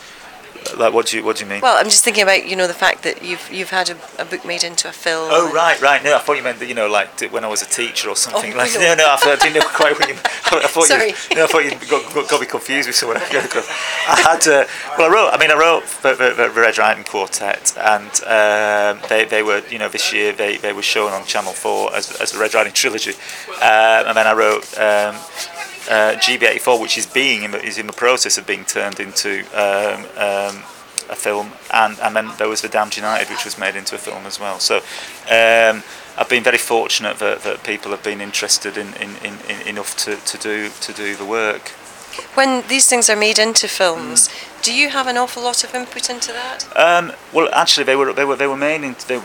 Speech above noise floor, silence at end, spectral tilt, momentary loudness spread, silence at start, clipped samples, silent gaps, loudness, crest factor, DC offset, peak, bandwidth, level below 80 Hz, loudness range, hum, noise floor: 21 dB; 0 s; -0.5 dB/octave; 12 LU; 0 s; under 0.1%; none; -15 LUFS; 16 dB; under 0.1%; 0 dBFS; 20 kHz; -60 dBFS; 6 LU; none; -38 dBFS